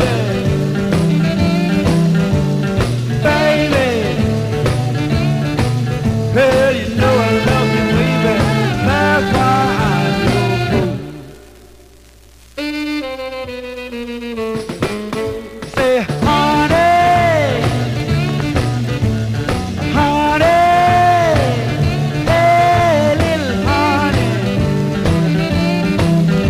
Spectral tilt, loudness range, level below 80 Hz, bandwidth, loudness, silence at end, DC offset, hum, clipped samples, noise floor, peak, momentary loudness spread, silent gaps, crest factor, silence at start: -6.5 dB/octave; 9 LU; -32 dBFS; 16 kHz; -15 LUFS; 0 s; 0.2%; none; under 0.1%; -43 dBFS; -2 dBFS; 10 LU; none; 12 dB; 0 s